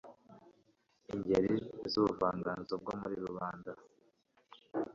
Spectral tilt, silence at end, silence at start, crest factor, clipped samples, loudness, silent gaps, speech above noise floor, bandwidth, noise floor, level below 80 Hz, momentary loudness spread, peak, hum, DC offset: -5 dB/octave; 0 s; 0.05 s; 20 dB; under 0.1%; -36 LUFS; none; 38 dB; 7.6 kHz; -73 dBFS; -66 dBFS; 15 LU; -18 dBFS; none; under 0.1%